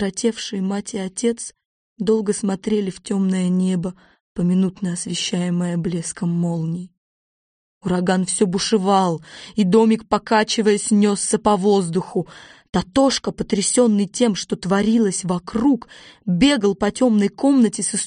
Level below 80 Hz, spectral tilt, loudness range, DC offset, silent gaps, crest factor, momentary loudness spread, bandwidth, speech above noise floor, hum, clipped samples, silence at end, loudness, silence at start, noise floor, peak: -50 dBFS; -5 dB/octave; 5 LU; under 0.1%; 1.65-1.96 s, 4.20-4.35 s, 6.97-7.81 s, 12.69-12.73 s; 16 dB; 9 LU; 10 kHz; over 71 dB; none; under 0.1%; 0 s; -19 LUFS; 0 s; under -90 dBFS; -4 dBFS